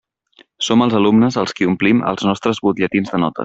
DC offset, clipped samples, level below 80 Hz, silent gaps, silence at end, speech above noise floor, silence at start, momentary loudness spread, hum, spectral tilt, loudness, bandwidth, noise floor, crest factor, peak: under 0.1%; under 0.1%; -54 dBFS; none; 0 s; 37 dB; 0.6 s; 5 LU; none; -5.5 dB/octave; -16 LUFS; 8 kHz; -52 dBFS; 14 dB; -2 dBFS